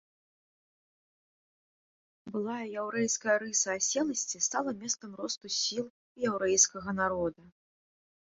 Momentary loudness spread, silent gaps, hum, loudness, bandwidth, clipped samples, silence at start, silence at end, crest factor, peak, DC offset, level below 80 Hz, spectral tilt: 11 LU; 5.90-6.15 s; none; -30 LUFS; 8.4 kHz; under 0.1%; 2.25 s; 0.8 s; 24 dB; -10 dBFS; under 0.1%; -68 dBFS; -2 dB/octave